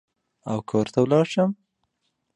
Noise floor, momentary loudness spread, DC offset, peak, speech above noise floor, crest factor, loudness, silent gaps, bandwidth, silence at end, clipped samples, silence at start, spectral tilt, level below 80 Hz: -75 dBFS; 16 LU; under 0.1%; -6 dBFS; 54 dB; 18 dB; -23 LUFS; none; 10.5 kHz; 0.8 s; under 0.1%; 0.45 s; -7 dB/octave; -62 dBFS